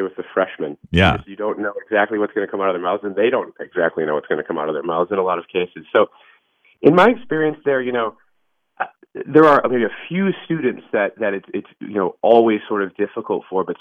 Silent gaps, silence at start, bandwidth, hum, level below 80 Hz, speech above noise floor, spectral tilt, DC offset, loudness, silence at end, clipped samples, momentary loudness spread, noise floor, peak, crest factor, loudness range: none; 0 s; 8.4 kHz; none; -46 dBFS; 51 dB; -7.5 dB/octave; under 0.1%; -19 LUFS; 0.05 s; under 0.1%; 12 LU; -70 dBFS; 0 dBFS; 18 dB; 3 LU